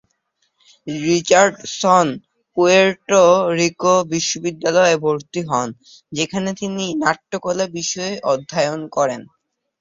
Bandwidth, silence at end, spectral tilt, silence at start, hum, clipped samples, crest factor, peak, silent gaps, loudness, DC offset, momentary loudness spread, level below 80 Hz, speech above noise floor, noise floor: 7.8 kHz; 0.6 s; -4 dB/octave; 0.85 s; none; under 0.1%; 18 dB; 0 dBFS; none; -17 LUFS; under 0.1%; 11 LU; -60 dBFS; 51 dB; -68 dBFS